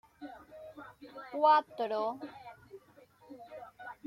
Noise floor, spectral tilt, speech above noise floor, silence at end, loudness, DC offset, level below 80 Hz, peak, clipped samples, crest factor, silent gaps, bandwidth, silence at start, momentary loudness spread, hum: -61 dBFS; -5 dB/octave; 31 dB; 0.15 s; -31 LUFS; under 0.1%; -78 dBFS; -14 dBFS; under 0.1%; 22 dB; none; 12.5 kHz; 0.2 s; 26 LU; none